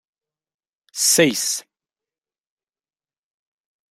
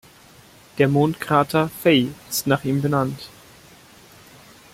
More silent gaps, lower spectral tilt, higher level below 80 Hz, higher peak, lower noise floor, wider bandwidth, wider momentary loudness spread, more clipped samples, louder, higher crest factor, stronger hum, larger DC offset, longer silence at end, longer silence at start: neither; second, -2 dB/octave vs -5.5 dB/octave; second, -68 dBFS vs -56 dBFS; about the same, -2 dBFS vs -2 dBFS; first, under -90 dBFS vs -49 dBFS; about the same, 16 kHz vs 16.5 kHz; about the same, 14 LU vs 12 LU; neither; first, -17 LUFS vs -20 LUFS; about the same, 24 dB vs 20 dB; neither; neither; first, 2.3 s vs 1.45 s; first, 0.95 s vs 0.75 s